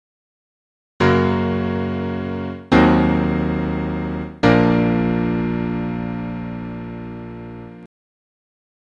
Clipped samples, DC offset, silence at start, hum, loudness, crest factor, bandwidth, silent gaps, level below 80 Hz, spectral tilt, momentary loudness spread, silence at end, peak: under 0.1%; under 0.1%; 1 s; none; -19 LUFS; 20 dB; 7.4 kHz; none; -36 dBFS; -8 dB/octave; 17 LU; 1 s; 0 dBFS